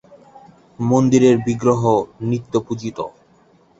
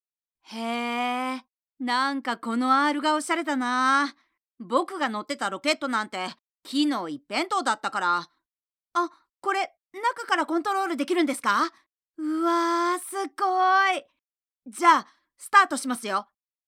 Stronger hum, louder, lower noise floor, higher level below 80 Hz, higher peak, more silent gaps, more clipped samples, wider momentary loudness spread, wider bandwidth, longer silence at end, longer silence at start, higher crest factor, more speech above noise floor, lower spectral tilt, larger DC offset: neither; first, -18 LUFS vs -25 LUFS; second, -54 dBFS vs under -90 dBFS; first, -54 dBFS vs under -90 dBFS; about the same, -2 dBFS vs -4 dBFS; neither; neither; about the same, 14 LU vs 12 LU; second, 8 kHz vs 16.5 kHz; first, 0.7 s vs 0.45 s; first, 0.8 s vs 0.5 s; about the same, 18 dB vs 22 dB; second, 37 dB vs over 65 dB; first, -7 dB/octave vs -2.5 dB/octave; neither